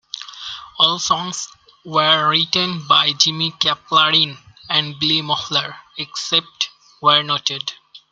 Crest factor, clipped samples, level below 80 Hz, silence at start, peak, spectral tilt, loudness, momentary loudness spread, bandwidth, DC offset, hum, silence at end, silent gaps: 20 dB; under 0.1%; -62 dBFS; 0.15 s; 0 dBFS; -2 dB/octave; -17 LUFS; 15 LU; 13 kHz; under 0.1%; none; 0.15 s; none